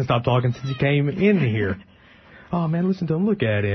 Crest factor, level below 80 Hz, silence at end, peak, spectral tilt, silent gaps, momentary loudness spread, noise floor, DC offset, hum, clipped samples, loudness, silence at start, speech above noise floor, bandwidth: 14 dB; -50 dBFS; 0 s; -6 dBFS; -8.5 dB/octave; none; 7 LU; -49 dBFS; under 0.1%; none; under 0.1%; -22 LUFS; 0 s; 28 dB; 6.2 kHz